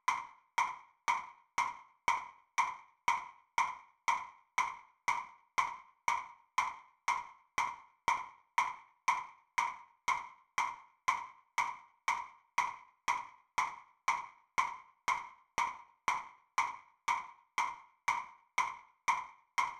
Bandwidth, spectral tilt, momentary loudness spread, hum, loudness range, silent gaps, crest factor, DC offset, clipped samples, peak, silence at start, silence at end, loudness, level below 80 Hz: 15 kHz; 0 dB/octave; 5 LU; none; 1 LU; none; 22 dB; under 0.1%; under 0.1%; -16 dBFS; 0.1 s; 0 s; -37 LUFS; -74 dBFS